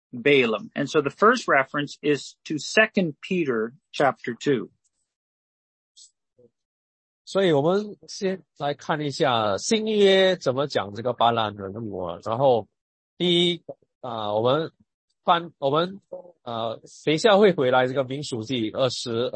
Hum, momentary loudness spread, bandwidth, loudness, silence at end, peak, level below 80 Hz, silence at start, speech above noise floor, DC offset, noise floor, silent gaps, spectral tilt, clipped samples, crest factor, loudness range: none; 13 LU; 8.8 kHz; -23 LUFS; 0.05 s; -4 dBFS; -68 dBFS; 0.15 s; 38 dB; under 0.1%; -61 dBFS; 5.16-5.95 s, 6.65-7.25 s, 12.81-13.17 s, 13.95-14.01 s, 14.94-15.08 s; -5 dB/octave; under 0.1%; 20 dB; 6 LU